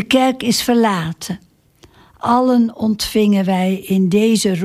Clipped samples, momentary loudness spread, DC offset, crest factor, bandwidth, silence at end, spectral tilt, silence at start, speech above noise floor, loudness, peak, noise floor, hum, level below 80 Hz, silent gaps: under 0.1%; 11 LU; under 0.1%; 14 dB; 16 kHz; 0 s; -5 dB/octave; 0 s; 35 dB; -16 LUFS; -2 dBFS; -50 dBFS; none; -48 dBFS; none